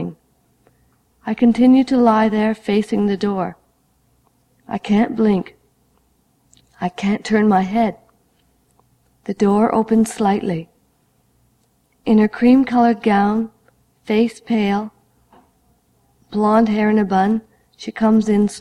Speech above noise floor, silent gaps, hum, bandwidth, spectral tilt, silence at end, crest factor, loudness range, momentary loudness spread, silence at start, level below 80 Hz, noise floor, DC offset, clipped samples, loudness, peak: 45 dB; none; none; 12 kHz; -7 dB/octave; 0 s; 16 dB; 5 LU; 14 LU; 0 s; -54 dBFS; -61 dBFS; under 0.1%; under 0.1%; -17 LUFS; -2 dBFS